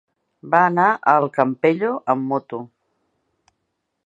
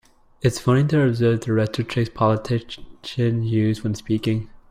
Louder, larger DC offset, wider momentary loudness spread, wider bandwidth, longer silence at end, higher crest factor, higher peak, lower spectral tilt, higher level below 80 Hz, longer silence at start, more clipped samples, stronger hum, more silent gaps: first, -18 LUFS vs -22 LUFS; neither; about the same, 10 LU vs 8 LU; second, 7.8 kHz vs 15 kHz; first, 1.4 s vs 0.15 s; about the same, 20 dB vs 16 dB; first, 0 dBFS vs -6 dBFS; about the same, -8 dB/octave vs -7 dB/octave; second, -72 dBFS vs -48 dBFS; about the same, 0.45 s vs 0.45 s; neither; neither; neither